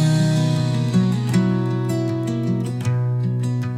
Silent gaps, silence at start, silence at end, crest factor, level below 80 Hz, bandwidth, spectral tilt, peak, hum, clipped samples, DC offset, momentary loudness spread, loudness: none; 0 s; 0 s; 12 dB; -56 dBFS; 13 kHz; -7 dB/octave; -8 dBFS; none; under 0.1%; under 0.1%; 4 LU; -20 LUFS